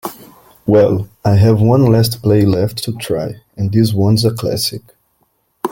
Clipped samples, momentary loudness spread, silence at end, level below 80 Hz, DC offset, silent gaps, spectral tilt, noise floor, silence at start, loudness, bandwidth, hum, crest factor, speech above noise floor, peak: under 0.1%; 13 LU; 0 s; -44 dBFS; under 0.1%; none; -7 dB/octave; -61 dBFS; 0.05 s; -14 LUFS; 17 kHz; none; 14 dB; 49 dB; 0 dBFS